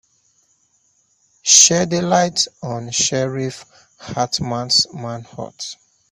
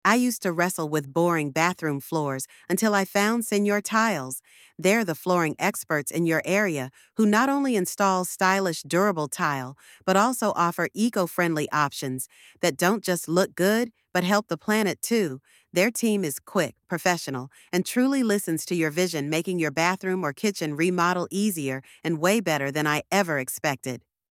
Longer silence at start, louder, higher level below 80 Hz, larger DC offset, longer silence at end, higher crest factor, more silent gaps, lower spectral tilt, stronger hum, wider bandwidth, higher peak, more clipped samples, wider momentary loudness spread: first, 1.45 s vs 0.05 s; first, -16 LUFS vs -25 LUFS; first, -56 dBFS vs -72 dBFS; neither; about the same, 0.35 s vs 0.35 s; about the same, 20 dB vs 20 dB; neither; second, -2 dB/octave vs -4.5 dB/octave; neither; about the same, 15.5 kHz vs 17 kHz; first, 0 dBFS vs -4 dBFS; neither; first, 21 LU vs 8 LU